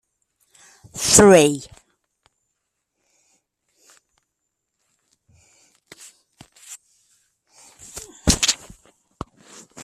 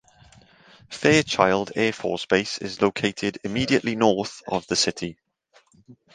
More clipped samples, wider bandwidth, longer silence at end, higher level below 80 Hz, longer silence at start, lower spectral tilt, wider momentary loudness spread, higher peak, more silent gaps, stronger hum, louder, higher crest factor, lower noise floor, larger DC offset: neither; first, 15 kHz vs 10 kHz; second, 0 s vs 0.2 s; first, -44 dBFS vs -56 dBFS; about the same, 0.95 s vs 0.9 s; about the same, -3 dB/octave vs -4 dB/octave; first, 29 LU vs 10 LU; about the same, 0 dBFS vs -2 dBFS; neither; neither; first, -16 LUFS vs -23 LUFS; about the same, 24 dB vs 22 dB; first, -78 dBFS vs -61 dBFS; neither